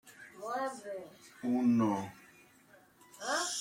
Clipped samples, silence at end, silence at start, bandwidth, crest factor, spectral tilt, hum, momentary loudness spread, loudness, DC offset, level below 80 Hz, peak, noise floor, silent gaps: under 0.1%; 0 s; 0.05 s; 16 kHz; 16 dB; -4 dB/octave; none; 18 LU; -34 LUFS; under 0.1%; -78 dBFS; -20 dBFS; -63 dBFS; none